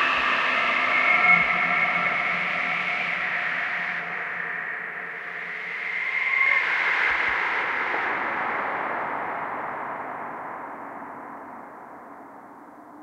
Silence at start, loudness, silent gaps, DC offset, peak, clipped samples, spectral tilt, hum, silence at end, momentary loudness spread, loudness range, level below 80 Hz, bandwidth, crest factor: 0 s; -23 LUFS; none; under 0.1%; -6 dBFS; under 0.1%; -3.5 dB/octave; none; 0 s; 18 LU; 13 LU; -64 dBFS; 11.5 kHz; 20 dB